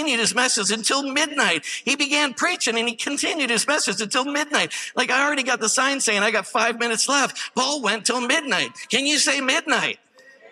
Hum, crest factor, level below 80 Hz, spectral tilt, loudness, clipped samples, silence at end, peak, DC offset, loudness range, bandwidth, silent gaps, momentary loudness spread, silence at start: none; 18 dB; -80 dBFS; -1 dB/octave; -20 LUFS; under 0.1%; 0.05 s; -4 dBFS; under 0.1%; 1 LU; 15.5 kHz; none; 5 LU; 0 s